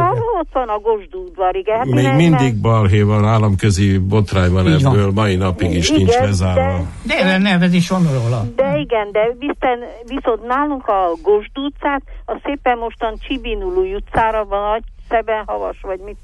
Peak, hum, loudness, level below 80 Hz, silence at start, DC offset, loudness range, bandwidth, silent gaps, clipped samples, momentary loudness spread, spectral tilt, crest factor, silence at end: -4 dBFS; none; -16 LUFS; -34 dBFS; 0 s; under 0.1%; 6 LU; 11.5 kHz; none; under 0.1%; 10 LU; -6.5 dB/octave; 12 dB; 0.05 s